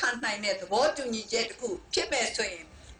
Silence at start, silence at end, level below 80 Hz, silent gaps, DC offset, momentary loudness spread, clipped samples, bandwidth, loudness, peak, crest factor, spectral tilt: 0 s; 0.05 s; -58 dBFS; none; under 0.1%; 7 LU; under 0.1%; 10.5 kHz; -29 LUFS; -12 dBFS; 18 dB; -1.5 dB/octave